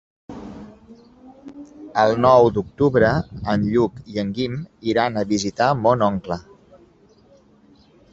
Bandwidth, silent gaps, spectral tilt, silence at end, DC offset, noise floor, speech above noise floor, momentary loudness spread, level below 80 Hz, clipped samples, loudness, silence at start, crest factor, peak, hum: 7.8 kHz; none; -6.5 dB/octave; 1.7 s; under 0.1%; -53 dBFS; 34 dB; 24 LU; -48 dBFS; under 0.1%; -20 LUFS; 0.3 s; 20 dB; -2 dBFS; none